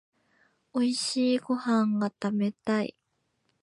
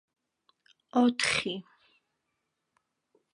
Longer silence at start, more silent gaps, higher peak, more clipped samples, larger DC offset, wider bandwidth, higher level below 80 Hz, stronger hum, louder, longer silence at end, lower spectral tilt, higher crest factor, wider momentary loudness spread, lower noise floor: second, 0.75 s vs 0.95 s; neither; second, -16 dBFS vs -12 dBFS; neither; neither; about the same, 11.5 kHz vs 11 kHz; second, -78 dBFS vs -68 dBFS; neither; about the same, -28 LUFS vs -28 LUFS; second, 0.7 s vs 1.75 s; first, -5 dB/octave vs -3 dB/octave; second, 14 dB vs 22 dB; second, 4 LU vs 12 LU; second, -76 dBFS vs -82 dBFS